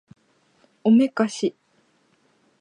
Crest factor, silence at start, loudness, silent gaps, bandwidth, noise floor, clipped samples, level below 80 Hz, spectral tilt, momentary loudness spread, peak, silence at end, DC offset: 18 dB; 0.85 s; -21 LUFS; none; 10.5 kHz; -64 dBFS; under 0.1%; -80 dBFS; -6 dB/octave; 10 LU; -6 dBFS; 1.1 s; under 0.1%